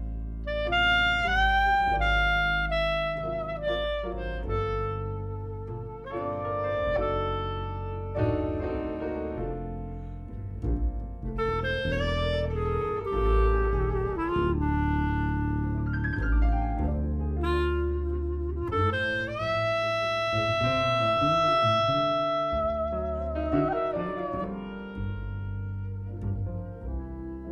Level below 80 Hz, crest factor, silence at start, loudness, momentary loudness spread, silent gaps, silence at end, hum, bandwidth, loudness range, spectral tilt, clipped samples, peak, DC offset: -34 dBFS; 16 dB; 0 s; -28 LUFS; 13 LU; none; 0 s; none; 9 kHz; 7 LU; -7 dB/octave; under 0.1%; -12 dBFS; under 0.1%